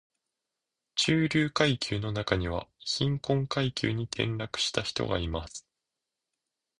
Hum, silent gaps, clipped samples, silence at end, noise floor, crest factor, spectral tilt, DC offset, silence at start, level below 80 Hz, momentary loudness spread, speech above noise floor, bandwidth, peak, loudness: none; none; under 0.1%; 1.2 s; -87 dBFS; 24 dB; -4.5 dB/octave; under 0.1%; 0.95 s; -48 dBFS; 9 LU; 58 dB; 11 kHz; -8 dBFS; -29 LUFS